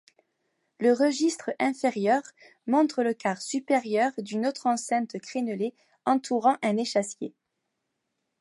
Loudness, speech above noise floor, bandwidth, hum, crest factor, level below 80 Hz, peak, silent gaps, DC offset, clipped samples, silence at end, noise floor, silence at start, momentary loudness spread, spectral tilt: -27 LUFS; 54 dB; 11.5 kHz; none; 18 dB; -82 dBFS; -10 dBFS; none; under 0.1%; under 0.1%; 1.1 s; -81 dBFS; 0.8 s; 9 LU; -4.5 dB/octave